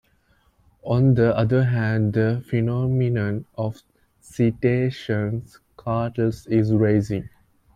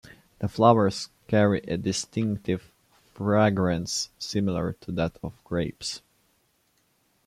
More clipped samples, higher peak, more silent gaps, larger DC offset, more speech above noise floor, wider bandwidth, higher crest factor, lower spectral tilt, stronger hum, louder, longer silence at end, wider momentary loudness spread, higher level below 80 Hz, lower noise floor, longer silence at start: neither; about the same, -6 dBFS vs -4 dBFS; neither; neither; about the same, 41 dB vs 43 dB; second, 9.4 kHz vs 14.5 kHz; second, 16 dB vs 22 dB; first, -9 dB/octave vs -5.5 dB/octave; neither; first, -22 LUFS vs -26 LUFS; second, 0.5 s vs 1.3 s; about the same, 11 LU vs 12 LU; first, -50 dBFS vs -56 dBFS; second, -62 dBFS vs -69 dBFS; first, 0.85 s vs 0.4 s